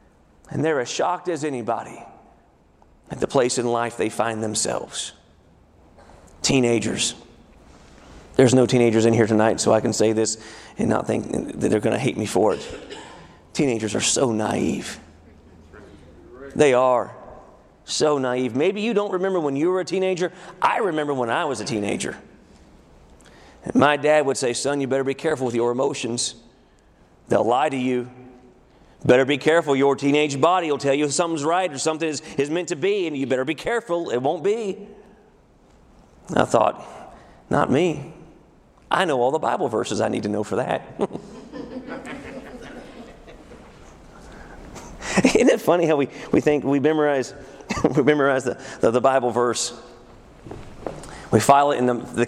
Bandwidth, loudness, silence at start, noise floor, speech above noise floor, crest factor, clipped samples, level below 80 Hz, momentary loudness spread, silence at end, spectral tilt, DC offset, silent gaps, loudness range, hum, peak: 15 kHz; -21 LUFS; 0.5 s; -55 dBFS; 34 dB; 22 dB; under 0.1%; -52 dBFS; 18 LU; 0 s; -4.5 dB/octave; under 0.1%; none; 6 LU; none; 0 dBFS